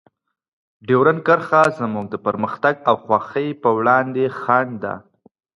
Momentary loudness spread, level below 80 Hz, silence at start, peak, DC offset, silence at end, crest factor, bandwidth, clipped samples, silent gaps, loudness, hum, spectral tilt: 10 LU; -62 dBFS; 0.85 s; -2 dBFS; under 0.1%; 0.6 s; 18 dB; 11 kHz; under 0.1%; none; -18 LUFS; none; -7 dB/octave